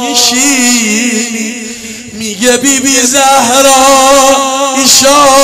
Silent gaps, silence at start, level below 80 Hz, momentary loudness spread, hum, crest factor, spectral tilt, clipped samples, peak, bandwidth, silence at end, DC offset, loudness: none; 0 s; -40 dBFS; 14 LU; none; 8 dB; -1 dB/octave; 0.5%; 0 dBFS; 16.5 kHz; 0 s; under 0.1%; -6 LUFS